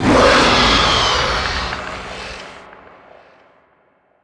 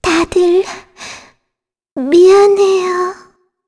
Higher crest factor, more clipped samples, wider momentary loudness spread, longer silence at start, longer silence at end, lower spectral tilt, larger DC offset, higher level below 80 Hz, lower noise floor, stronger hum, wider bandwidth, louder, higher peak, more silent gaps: first, 18 dB vs 12 dB; neither; second, 19 LU vs 22 LU; about the same, 0 s vs 0.05 s; first, 1.55 s vs 0.55 s; about the same, -3.5 dB/octave vs -4 dB/octave; neither; first, -32 dBFS vs -44 dBFS; second, -58 dBFS vs -78 dBFS; neither; about the same, 11 kHz vs 11 kHz; about the same, -13 LUFS vs -11 LUFS; about the same, 0 dBFS vs 0 dBFS; second, none vs 1.91-1.96 s